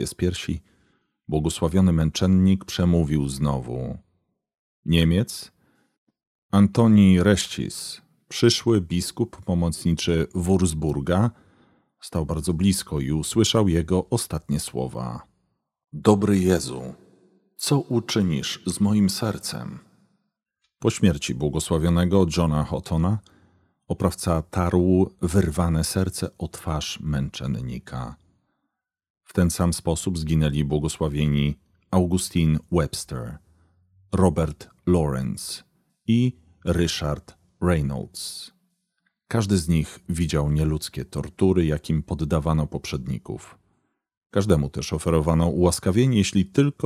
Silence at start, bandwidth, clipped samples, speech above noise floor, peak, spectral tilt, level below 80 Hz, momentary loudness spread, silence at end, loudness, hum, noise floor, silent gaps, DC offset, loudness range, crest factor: 0 s; 15 kHz; under 0.1%; 58 dB; 0 dBFS; -6 dB/octave; -38 dBFS; 13 LU; 0 s; -23 LUFS; none; -80 dBFS; 4.59-4.83 s, 5.98-6.07 s, 6.27-6.49 s, 29.10-29.15 s, 44.17-44.21 s; under 0.1%; 5 LU; 22 dB